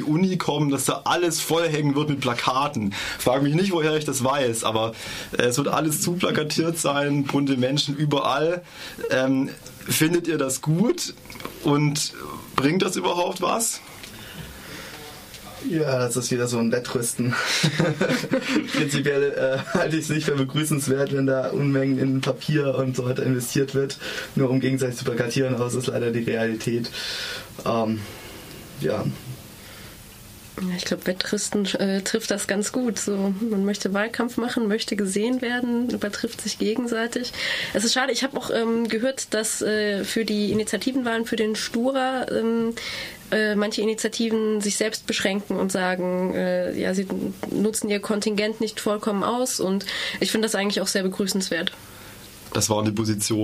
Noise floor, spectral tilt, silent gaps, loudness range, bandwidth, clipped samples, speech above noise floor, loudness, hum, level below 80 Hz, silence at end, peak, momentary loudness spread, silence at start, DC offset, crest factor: -43 dBFS; -4.5 dB/octave; none; 4 LU; 15.5 kHz; under 0.1%; 20 dB; -24 LUFS; none; -56 dBFS; 0 s; -2 dBFS; 9 LU; 0 s; under 0.1%; 22 dB